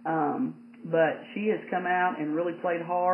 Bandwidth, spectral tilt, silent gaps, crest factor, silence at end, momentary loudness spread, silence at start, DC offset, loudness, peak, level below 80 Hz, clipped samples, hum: 3.3 kHz; -9 dB/octave; none; 16 dB; 0 s; 6 LU; 0 s; under 0.1%; -28 LUFS; -12 dBFS; under -90 dBFS; under 0.1%; none